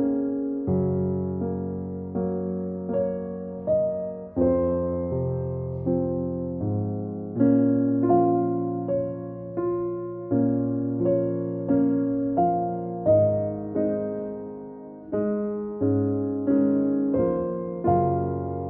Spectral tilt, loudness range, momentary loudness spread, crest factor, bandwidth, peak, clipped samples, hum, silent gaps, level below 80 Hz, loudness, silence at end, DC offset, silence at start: -13 dB/octave; 4 LU; 10 LU; 16 dB; 2.4 kHz; -8 dBFS; under 0.1%; none; none; -56 dBFS; -25 LUFS; 0 s; under 0.1%; 0 s